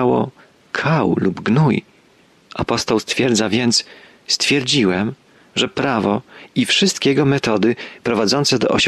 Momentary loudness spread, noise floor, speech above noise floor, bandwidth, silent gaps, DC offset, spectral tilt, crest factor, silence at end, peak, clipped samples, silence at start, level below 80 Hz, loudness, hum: 10 LU; -52 dBFS; 35 dB; 13 kHz; none; under 0.1%; -4.5 dB/octave; 14 dB; 0 s; -4 dBFS; under 0.1%; 0 s; -52 dBFS; -17 LUFS; none